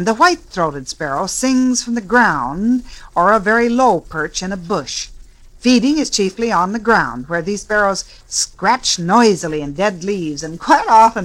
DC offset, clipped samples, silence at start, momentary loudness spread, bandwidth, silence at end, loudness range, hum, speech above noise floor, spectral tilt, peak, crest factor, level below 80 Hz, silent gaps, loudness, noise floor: under 0.1%; under 0.1%; 0 s; 10 LU; 13 kHz; 0 s; 2 LU; none; 23 dB; -3.5 dB/octave; 0 dBFS; 16 dB; -42 dBFS; none; -16 LUFS; -39 dBFS